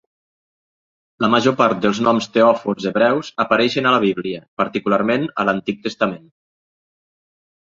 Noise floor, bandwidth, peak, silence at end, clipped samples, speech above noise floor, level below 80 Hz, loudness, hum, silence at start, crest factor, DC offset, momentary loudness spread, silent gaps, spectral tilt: under -90 dBFS; 7.6 kHz; -2 dBFS; 1.55 s; under 0.1%; over 72 dB; -60 dBFS; -18 LUFS; none; 1.2 s; 18 dB; under 0.1%; 7 LU; 4.48-4.57 s; -5.5 dB/octave